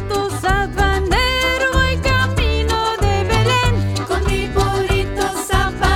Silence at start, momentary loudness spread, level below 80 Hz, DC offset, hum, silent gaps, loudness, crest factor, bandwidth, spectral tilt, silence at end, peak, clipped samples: 0 s; 4 LU; -22 dBFS; under 0.1%; none; none; -17 LUFS; 14 dB; 17.5 kHz; -4.5 dB/octave; 0 s; -2 dBFS; under 0.1%